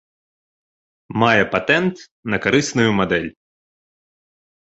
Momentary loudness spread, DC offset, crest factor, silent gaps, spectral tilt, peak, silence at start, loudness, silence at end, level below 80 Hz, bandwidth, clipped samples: 11 LU; under 0.1%; 20 dB; 2.11-2.23 s; -5 dB/octave; -2 dBFS; 1.1 s; -18 LUFS; 1.4 s; -52 dBFS; 8.2 kHz; under 0.1%